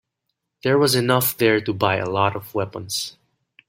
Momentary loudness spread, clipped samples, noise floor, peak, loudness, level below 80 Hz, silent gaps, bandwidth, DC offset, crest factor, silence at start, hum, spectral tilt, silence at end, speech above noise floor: 10 LU; under 0.1%; -78 dBFS; -2 dBFS; -20 LUFS; -58 dBFS; none; 16.5 kHz; under 0.1%; 20 dB; 0.65 s; none; -4.5 dB/octave; 0.6 s; 58 dB